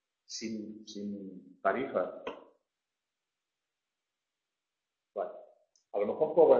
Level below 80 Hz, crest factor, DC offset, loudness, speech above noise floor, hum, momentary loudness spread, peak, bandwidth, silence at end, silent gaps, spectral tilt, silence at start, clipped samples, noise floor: -78 dBFS; 24 dB; under 0.1%; -35 LUFS; 60 dB; none; 14 LU; -10 dBFS; 7.4 kHz; 0 s; none; -4 dB/octave; 0.3 s; under 0.1%; -90 dBFS